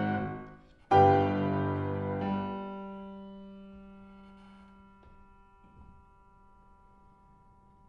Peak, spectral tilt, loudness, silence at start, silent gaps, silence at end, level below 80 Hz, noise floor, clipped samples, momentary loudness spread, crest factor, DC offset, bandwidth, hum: -12 dBFS; -9 dB/octave; -29 LUFS; 0 s; none; 1.95 s; -60 dBFS; -60 dBFS; under 0.1%; 27 LU; 22 dB; under 0.1%; 6.6 kHz; none